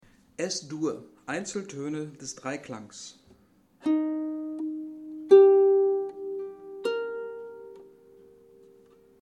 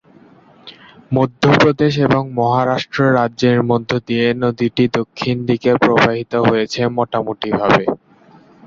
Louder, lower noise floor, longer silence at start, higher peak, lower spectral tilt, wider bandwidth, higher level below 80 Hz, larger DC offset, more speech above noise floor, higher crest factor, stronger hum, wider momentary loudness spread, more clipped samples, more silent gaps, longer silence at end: second, -26 LUFS vs -16 LUFS; first, -61 dBFS vs -47 dBFS; second, 0.4 s vs 0.65 s; second, -6 dBFS vs 0 dBFS; second, -5 dB/octave vs -6.5 dB/octave; first, 9.8 kHz vs 7.4 kHz; second, -74 dBFS vs -50 dBFS; neither; second, 27 dB vs 31 dB; first, 22 dB vs 16 dB; neither; first, 23 LU vs 8 LU; neither; neither; first, 1.4 s vs 0.7 s